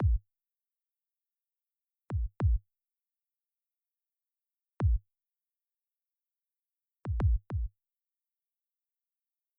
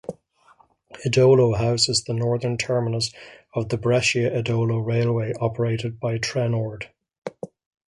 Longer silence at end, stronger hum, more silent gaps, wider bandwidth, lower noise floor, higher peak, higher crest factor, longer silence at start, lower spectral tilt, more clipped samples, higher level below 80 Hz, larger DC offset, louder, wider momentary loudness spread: first, 1.9 s vs 0.4 s; neither; second, none vs 7.18-7.22 s; second, 1.5 kHz vs 11.5 kHz; first, under -90 dBFS vs -57 dBFS; second, -18 dBFS vs -6 dBFS; about the same, 18 dB vs 18 dB; about the same, 0 s vs 0.1 s; first, -10 dB/octave vs -5 dB/octave; neither; first, -38 dBFS vs -52 dBFS; neither; second, -34 LUFS vs -22 LUFS; second, 8 LU vs 18 LU